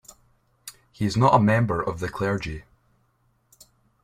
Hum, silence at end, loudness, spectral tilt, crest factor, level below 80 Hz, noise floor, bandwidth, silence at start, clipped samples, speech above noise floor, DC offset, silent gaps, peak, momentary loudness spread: none; 1.4 s; -23 LUFS; -7 dB/octave; 22 dB; -50 dBFS; -67 dBFS; 15.5 kHz; 0.65 s; under 0.1%; 45 dB; under 0.1%; none; -4 dBFS; 25 LU